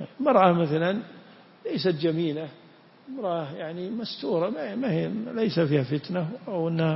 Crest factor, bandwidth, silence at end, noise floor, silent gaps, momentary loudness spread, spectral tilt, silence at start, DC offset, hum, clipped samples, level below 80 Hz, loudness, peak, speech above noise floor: 22 dB; 5.8 kHz; 0 s; -52 dBFS; none; 13 LU; -10.5 dB/octave; 0 s; under 0.1%; none; under 0.1%; -70 dBFS; -26 LUFS; -6 dBFS; 26 dB